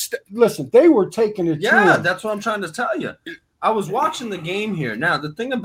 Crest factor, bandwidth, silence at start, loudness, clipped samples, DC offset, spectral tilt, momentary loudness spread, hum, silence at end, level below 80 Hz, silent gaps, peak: 18 dB; 16.5 kHz; 0 s; -19 LUFS; under 0.1%; under 0.1%; -5 dB/octave; 12 LU; none; 0 s; -62 dBFS; none; 0 dBFS